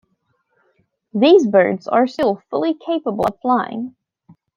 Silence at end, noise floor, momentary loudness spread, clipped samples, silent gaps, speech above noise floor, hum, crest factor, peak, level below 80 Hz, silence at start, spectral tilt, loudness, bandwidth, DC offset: 0.65 s; -67 dBFS; 14 LU; under 0.1%; none; 51 dB; none; 18 dB; -2 dBFS; -60 dBFS; 1.15 s; -6.5 dB/octave; -17 LUFS; 9.6 kHz; under 0.1%